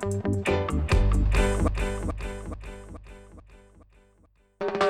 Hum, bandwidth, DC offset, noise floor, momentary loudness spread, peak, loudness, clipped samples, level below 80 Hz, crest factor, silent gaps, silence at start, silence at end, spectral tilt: none; 12.5 kHz; under 0.1%; -62 dBFS; 21 LU; -8 dBFS; -27 LUFS; under 0.1%; -30 dBFS; 18 dB; none; 0 s; 0 s; -6 dB/octave